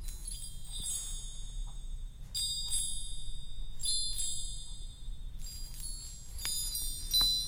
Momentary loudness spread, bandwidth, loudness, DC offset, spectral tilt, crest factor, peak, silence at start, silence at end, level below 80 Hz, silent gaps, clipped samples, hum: 16 LU; 16.5 kHz; -35 LUFS; under 0.1%; 0 dB/octave; 20 dB; -16 dBFS; 0 s; 0 s; -42 dBFS; none; under 0.1%; none